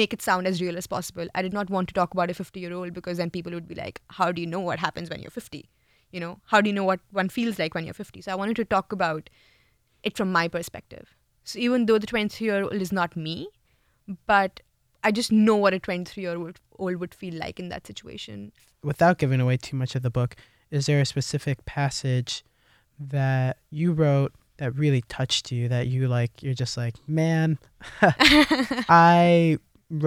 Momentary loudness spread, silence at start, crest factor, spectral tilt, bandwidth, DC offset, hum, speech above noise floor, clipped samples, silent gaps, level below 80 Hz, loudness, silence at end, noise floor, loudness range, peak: 17 LU; 0 s; 24 dB; -5.5 dB/octave; 15.5 kHz; under 0.1%; none; 42 dB; under 0.1%; none; -54 dBFS; -24 LUFS; 0 s; -66 dBFS; 7 LU; 0 dBFS